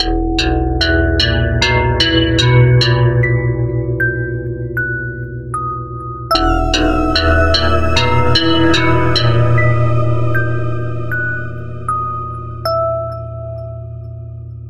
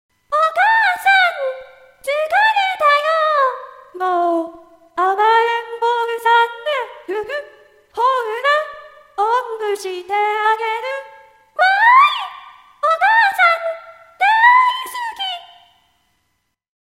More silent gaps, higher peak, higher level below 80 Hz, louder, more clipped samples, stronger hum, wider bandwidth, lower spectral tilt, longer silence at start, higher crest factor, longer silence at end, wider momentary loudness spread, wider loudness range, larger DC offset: neither; about the same, 0 dBFS vs 0 dBFS; first, -24 dBFS vs -68 dBFS; about the same, -14 LUFS vs -16 LUFS; neither; neither; second, 12.5 kHz vs 16 kHz; first, -6 dB/octave vs -0.5 dB/octave; second, 0 s vs 0.3 s; about the same, 14 dB vs 18 dB; second, 0 s vs 1.45 s; about the same, 14 LU vs 16 LU; about the same, 7 LU vs 5 LU; neither